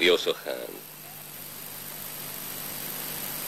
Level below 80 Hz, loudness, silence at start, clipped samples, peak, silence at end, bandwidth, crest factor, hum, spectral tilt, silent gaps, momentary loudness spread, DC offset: -66 dBFS; -32 LUFS; 0 s; under 0.1%; -10 dBFS; 0 s; 16.5 kHz; 22 dB; none; -2 dB/octave; none; 12 LU; under 0.1%